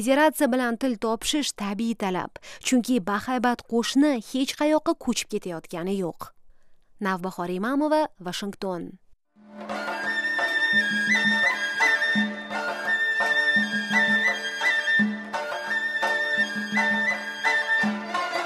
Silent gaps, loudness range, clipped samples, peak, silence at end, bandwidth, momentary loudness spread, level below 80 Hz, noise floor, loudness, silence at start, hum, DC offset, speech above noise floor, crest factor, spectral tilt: none; 7 LU; under 0.1%; -8 dBFS; 0 s; 15.5 kHz; 11 LU; -60 dBFS; -53 dBFS; -24 LUFS; 0 s; none; under 0.1%; 27 dB; 16 dB; -3.5 dB/octave